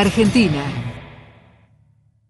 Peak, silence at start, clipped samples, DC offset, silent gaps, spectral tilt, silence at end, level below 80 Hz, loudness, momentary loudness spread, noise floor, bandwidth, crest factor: -4 dBFS; 0 s; under 0.1%; under 0.1%; none; -6 dB/octave; 1.15 s; -42 dBFS; -18 LUFS; 23 LU; -57 dBFS; 11.5 kHz; 16 dB